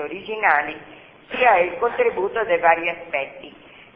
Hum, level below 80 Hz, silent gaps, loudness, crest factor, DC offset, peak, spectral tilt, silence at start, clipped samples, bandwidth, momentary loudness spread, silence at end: none; -58 dBFS; none; -20 LUFS; 20 dB; under 0.1%; -2 dBFS; -7.5 dB/octave; 0 s; under 0.1%; 5 kHz; 15 LU; 0.45 s